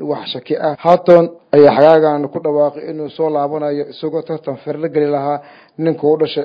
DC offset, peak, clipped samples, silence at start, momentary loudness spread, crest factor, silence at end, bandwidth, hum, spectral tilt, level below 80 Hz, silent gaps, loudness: under 0.1%; 0 dBFS; 0.3%; 0 s; 13 LU; 14 dB; 0 s; 5.6 kHz; none; -8.5 dB/octave; -60 dBFS; none; -15 LUFS